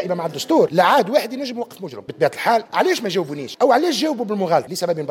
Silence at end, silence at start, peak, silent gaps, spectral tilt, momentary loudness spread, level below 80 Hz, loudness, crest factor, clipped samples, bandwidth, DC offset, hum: 0 s; 0 s; -4 dBFS; none; -4.5 dB/octave; 13 LU; -72 dBFS; -19 LUFS; 16 dB; under 0.1%; 17 kHz; under 0.1%; none